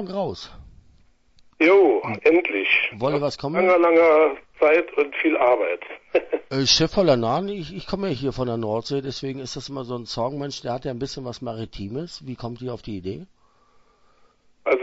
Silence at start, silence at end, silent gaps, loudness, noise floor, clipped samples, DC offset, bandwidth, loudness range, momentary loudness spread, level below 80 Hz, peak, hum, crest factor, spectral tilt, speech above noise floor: 0 s; 0 s; none; -22 LUFS; -58 dBFS; under 0.1%; under 0.1%; 8 kHz; 13 LU; 16 LU; -50 dBFS; -4 dBFS; none; 18 dB; -4.5 dB/octave; 36 dB